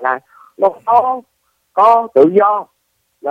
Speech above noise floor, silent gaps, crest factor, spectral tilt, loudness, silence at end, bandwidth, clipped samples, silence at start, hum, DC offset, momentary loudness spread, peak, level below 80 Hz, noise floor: 53 dB; none; 14 dB; -7.5 dB/octave; -13 LUFS; 0 s; 6.2 kHz; under 0.1%; 0 s; none; under 0.1%; 13 LU; 0 dBFS; -64 dBFS; -65 dBFS